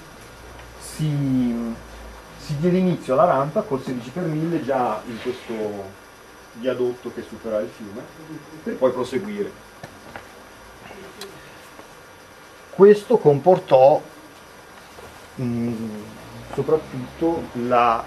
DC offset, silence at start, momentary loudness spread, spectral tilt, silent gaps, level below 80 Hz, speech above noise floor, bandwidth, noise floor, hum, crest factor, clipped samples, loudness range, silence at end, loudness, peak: under 0.1%; 0 s; 26 LU; -7 dB/octave; none; -52 dBFS; 24 dB; 14.5 kHz; -45 dBFS; none; 22 dB; under 0.1%; 11 LU; 0 s; -21 LUFS; 0 dBFS